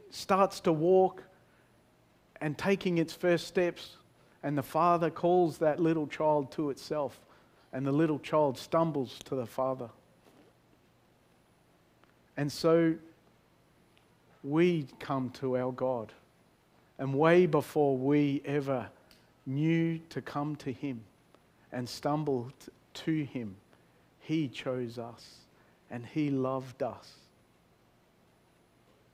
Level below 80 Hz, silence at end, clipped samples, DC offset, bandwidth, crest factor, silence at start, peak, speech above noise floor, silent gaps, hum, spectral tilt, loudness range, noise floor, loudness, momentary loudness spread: -70 dBFS; 2.05 s; under 0.1%; under 0.1%; 15.5 kHz; 22 dB; 0.15 s; -10 dBFS; 36 dB; none; none; -7 dB/octave; 8 LU; -66 dBFS; -31 LUFS; 16 LU